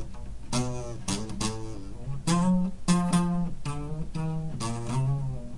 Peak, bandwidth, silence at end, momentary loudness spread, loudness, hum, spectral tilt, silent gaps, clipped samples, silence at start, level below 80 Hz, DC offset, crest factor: -10 dBFS; 11.5 kHz; 0 s; 14 LU; -29 LUFS; none; -5.5 dB/octave; none; under 0.1%; 0 s; -42 dBFS; 1%; 18 dB